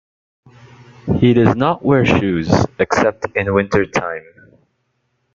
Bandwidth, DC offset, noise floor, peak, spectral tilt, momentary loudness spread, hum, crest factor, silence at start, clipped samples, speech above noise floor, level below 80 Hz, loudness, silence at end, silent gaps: 7.6 kHz; under 0.1%; -67 dBFS; -2 dBFS; -7 dB/octave; 9 LU; none; 16 dB; 1.05 s; under 0.1%; 52 dB; -44 dBFS; -16 LUFS; 1.15 s; none